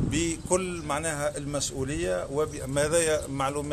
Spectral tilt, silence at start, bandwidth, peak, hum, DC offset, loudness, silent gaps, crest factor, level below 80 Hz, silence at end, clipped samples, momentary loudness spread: -4 dB/octave; 0 s; 13.5 kHz; -10 dBFS; none; under 0.1%; -28 LUFS; none; 18 dB; -44 dBFS; 0 s; under 0.1%; 6 LU